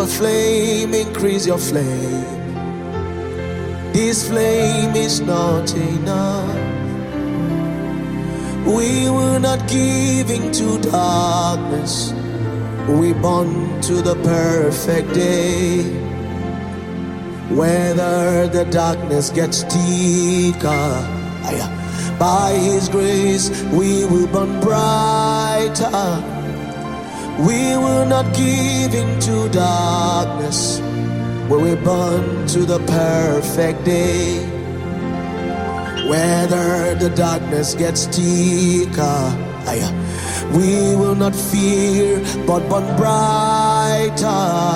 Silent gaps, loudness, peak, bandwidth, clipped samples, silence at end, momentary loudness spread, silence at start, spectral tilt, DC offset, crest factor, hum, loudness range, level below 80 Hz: none; -17 LUFS; -4 dBFS; 16.5 kHz; under 0.1%; 0 s; 8 LU; 0 s; -5 dB/octave; under 0.1%; 14 dB; none; 3 LU; -40 dBFS